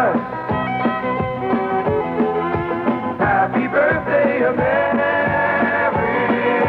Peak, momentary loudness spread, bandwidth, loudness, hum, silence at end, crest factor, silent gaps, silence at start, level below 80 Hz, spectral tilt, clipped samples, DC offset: -6 dBFS; 5 LU; 5.4 kHz; -18 LUFS; none; 0 s; 12 dB; none; 0 s; -46 dBFS; -9 dB/octave; under 0.1%; under 0.1%